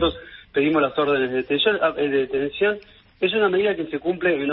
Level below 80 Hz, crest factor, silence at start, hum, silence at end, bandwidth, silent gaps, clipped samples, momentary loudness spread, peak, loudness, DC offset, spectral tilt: -50 dBFS; 16 dB; 0 s; none; 0 s; 5.4 kHz; none; under 0.1%; 6 LU; -6 dBFS; -21 LUFS; under 0.1%; -9.5 dB/octave